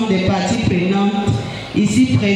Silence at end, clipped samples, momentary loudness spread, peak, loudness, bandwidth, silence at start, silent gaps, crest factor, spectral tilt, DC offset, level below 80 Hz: 0 s; under 0.1%; 6 LU; -2 dBFS; -17 LUFS; 11.5 kHz; 0 s; none; 12 dB; -6 dB/octave; under 0.1%; -42 dBFS